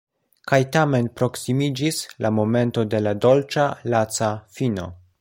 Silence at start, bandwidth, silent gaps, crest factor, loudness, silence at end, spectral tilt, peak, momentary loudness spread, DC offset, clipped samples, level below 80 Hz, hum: 0.45 s; 16.5 kHz; none; 18 dB; -21 LUFS; 0.25 s; -5.5 dB/octave; -4 dBFS; 7 LU; under 0.1%; under 0.1%; -56 dBFS; none